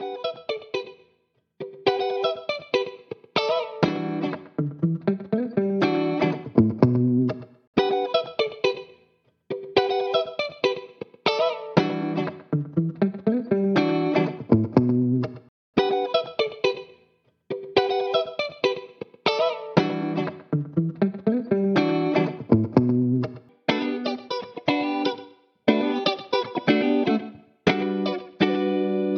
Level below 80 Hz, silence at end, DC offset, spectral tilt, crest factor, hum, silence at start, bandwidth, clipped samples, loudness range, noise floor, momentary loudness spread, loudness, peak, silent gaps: -60 dBFS; 0 s; under 0.1%; -7.5 dB/octave; 22 dB; none; 0 s; 6.6 kHz; under 0.1%; 3 LU; -69 dBFS; 9 LU; -24 LUFS; -2 dBFS; 7.67-7.73 s, 15.49-15.73 s